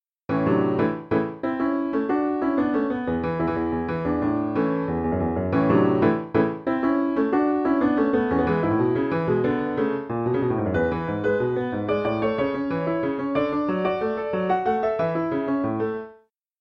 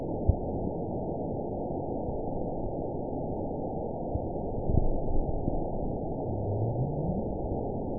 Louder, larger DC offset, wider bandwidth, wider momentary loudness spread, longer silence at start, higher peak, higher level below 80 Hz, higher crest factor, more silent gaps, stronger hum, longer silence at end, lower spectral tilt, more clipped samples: first, -24 LUFS vs -33 LUFS; second, under 0.1% vs 0.5%; first, 5.8 kHz vs 1 kHz; about the same, 4 LU vs 4 LU; first, 0.3 s vs 0 s; first, -6 dBFS vs -10 dBFS; second, -48 dBFS vs -36 dBFS; second, 16 dB vs 22 dB; neither; neither; first, 0.45 s vs 0 s; second, -10 dB/octave vs -17 dB/octave; neither